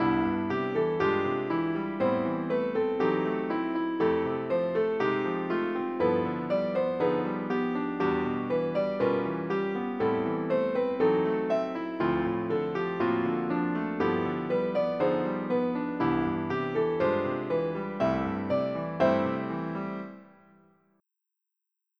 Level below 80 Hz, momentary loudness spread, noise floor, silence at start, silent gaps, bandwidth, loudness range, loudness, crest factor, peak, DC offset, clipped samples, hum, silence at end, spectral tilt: -60 dBFS; 4 LU; -86 dBFS; 0 s; none; 6.4 kHz; 1 LU; -29 LUFS; 16 dB; -12 dBFS; under 0.1%; under 0.1%; none; 1.75 s; -8.5 dB/octave